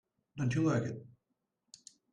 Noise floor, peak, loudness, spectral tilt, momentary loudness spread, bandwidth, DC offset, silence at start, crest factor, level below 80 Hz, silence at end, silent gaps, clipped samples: -84 dBFS; -20 dBFS; -34 LUFS; -7 dB/octave; 24 LU; 10 kHz; under 0.1%; 0.35 s; 16 dB; -68 dBFS; 1.05 s; none; under 0.1%